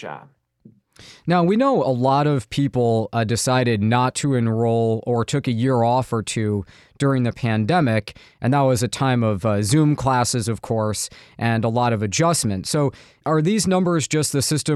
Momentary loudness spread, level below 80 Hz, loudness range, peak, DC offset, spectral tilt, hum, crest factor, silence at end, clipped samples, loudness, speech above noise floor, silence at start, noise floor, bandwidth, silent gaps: 6 LU; -52 dBFS; 2 LU; -4 dBFS; under 0.1%; -5.5 dB/octave; none; 16 dB; 0 s; under 0.1%; -20 LUFS; 33 dB; 0 s; -52 dBFS; 13.5 kHz; none